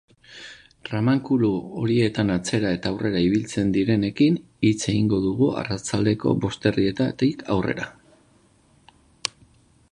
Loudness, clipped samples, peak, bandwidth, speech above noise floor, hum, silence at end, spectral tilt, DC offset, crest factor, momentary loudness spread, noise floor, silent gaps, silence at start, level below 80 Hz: -23 LUFS; under 0.1%; -2 dBFS; 11 kHz; 36 dB; none; 0.6 s; -6 dB/octave; under 0.1%; 22 dB; 10 LU; -58 dBFS; none; 0.3 s; -50 dBFS